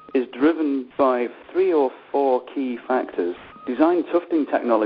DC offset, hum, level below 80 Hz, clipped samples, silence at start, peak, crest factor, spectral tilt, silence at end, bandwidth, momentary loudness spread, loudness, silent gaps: under 0.1%; none; -66 dBFS; under 0.1%; 0.15 s; -4 dBFS; 18 dB; -8.5 dB/octave; 0 s; 5.2 kHz; 8 LU; -22 LUFS; none